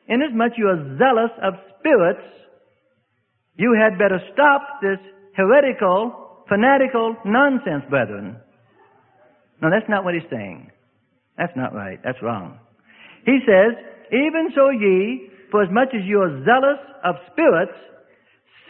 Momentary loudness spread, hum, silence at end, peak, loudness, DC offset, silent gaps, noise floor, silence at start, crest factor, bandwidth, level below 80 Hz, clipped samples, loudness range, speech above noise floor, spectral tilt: 13 LU; none; 0.95 s; -2 dBFS; -18 LUFS; under 0.1%; none; -69 dBFS; 0.1 s; 18 dB; 3.9 kHz; -64 dBFS; under 0.1%; 7 LU; 51 dB; -11 dB/octave